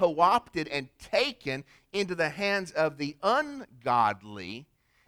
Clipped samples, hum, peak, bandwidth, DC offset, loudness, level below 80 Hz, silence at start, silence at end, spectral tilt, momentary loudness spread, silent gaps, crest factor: under 0.1%; none; -10 dBFS; 15.5 kHz; under 0.1%; -29 LUFS; -64 dBFS; 0 s; 0.45 s; -4.5 dB/octave; 14 LU; none; 20 dB